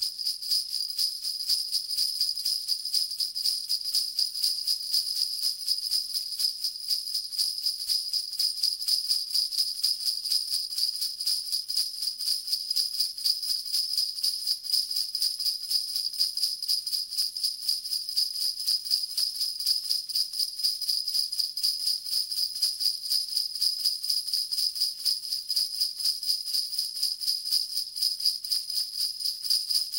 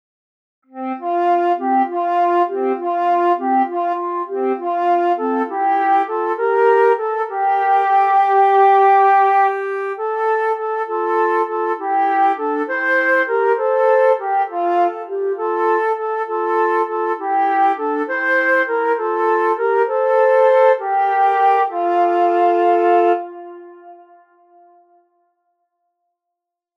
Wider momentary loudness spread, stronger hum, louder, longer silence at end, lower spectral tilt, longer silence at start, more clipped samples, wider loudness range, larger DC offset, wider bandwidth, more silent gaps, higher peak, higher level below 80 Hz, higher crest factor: second, 3 LU vs 8 LU; neither; second, -26 LUFS vs -16 LUFS; second, 0 s vs 2.85 s; second, 5 dB/octave vs -4 dB/octave; second, 0 s vs 0.75 s; neither; second, 1 LU vs 4 LU; neither; first, 17 kHz vs 6.6 kHz; neither; second, -10 dBFS vs -2 dBFS; first, -74 dBFS vs under -90 dBFS; first, 20 dB vs 14 dB